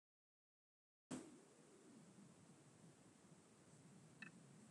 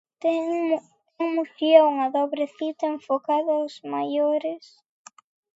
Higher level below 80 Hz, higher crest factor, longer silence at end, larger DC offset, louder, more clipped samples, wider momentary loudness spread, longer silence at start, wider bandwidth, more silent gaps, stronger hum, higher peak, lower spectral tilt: second, under -90 dBFS vs -84 dBFS; about the same, 26 dB vs 22 dB; second, 0 s vs 1 s; neither; second, -63 LUFS vs -24 LUFS; neither; about the same, 12 LU vs 12 LU; first, 1.1 s vs 0.25 s; first, 11.5 kHz vs 7.8 kHz; neither; neither; second, -38 dBFS vs -2 dBFS; about the same, -4.5 dB/octave vs -4.5 dB/octave